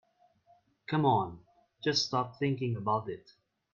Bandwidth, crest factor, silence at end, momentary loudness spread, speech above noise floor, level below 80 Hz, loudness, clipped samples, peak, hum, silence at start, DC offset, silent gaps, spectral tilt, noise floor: 7.4 kHz; 18 dB; 0.55 s; 14 LU; 36 dB; -70 dBFS; -31 LUFS; under 0.1%; -14 dBFS; none; 0.9 s; under 0.1%; none; -5.5 dB/octave; -67 dBFS